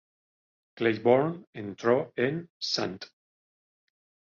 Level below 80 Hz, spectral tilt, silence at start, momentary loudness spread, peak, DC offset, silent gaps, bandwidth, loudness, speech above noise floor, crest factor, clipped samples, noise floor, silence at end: -70 dBFS; -5.5 dB/octave; 0.75 s; 16 LU; -8 dBFS; under 0.1%; 1.47-1.53 s, 2.50-2.60 s; 7.4 kHz; -28 LUFS; over 62 dB; 22 dB; under 0.1%; under -90 dBFS; 1.25 s